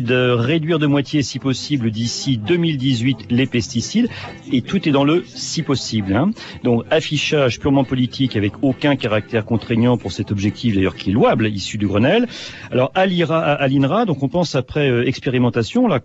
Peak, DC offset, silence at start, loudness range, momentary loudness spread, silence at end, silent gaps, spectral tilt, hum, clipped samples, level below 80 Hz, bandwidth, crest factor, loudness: -4 dBFS; under 0.1%; 0 s; 2 LU; 5 LU; 0.05 s; none; -6 dB/octave; none; under 0.1%; -48 dBFS; 8.2 kHz; 12 dB; -18 LUFS